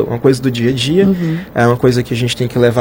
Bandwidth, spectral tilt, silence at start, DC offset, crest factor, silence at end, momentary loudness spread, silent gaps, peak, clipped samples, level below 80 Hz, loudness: 16.5 kHz; -6.5 dB/octave; 0 s; under 0.1%; 12 dB; 0 s; 5 LU; none; 0 dBFS; under 0.1%; -40 dBFS; -14 LUFS